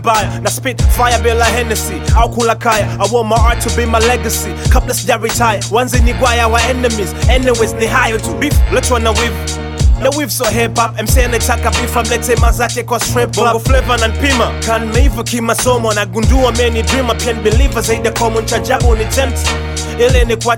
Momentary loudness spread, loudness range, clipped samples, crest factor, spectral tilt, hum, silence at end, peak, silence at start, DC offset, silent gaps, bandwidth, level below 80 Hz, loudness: 4 LU; 1 LU; under 0.1%; 12 dB; -4 dB/octave; none; 0 s; 0 dBFS; 0 s; under 0.1%; none; 17.5 kHz; -18 dBFS; -13 LUFS